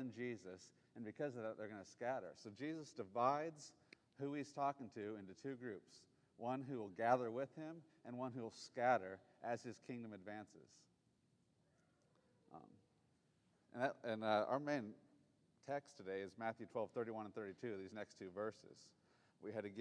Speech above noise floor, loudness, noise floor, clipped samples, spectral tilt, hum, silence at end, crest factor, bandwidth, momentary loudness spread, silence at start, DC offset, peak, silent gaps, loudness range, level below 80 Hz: 34 dB; -46 LUFS; -80 dBFS; under 0.1%; -6 dB/octave; none; 0 s; 24 dB; 10 kHz; 19 LU; 0 s; under 0.1%; -24 dBFS; none; 9 LU; under -90 dBFS